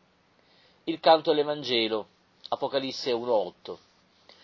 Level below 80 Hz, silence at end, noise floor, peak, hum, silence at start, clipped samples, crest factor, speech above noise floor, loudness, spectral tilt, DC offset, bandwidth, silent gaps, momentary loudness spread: -74 dBFS; 0.7 s; -64 dBFS; -8 dBFS; none; 0.85 s; under 0.1%; 22 dB; 38 dB; -27 LUFS; -4.5 dB/octave; under 0.1%; 7.4 kHz; none; 21 LU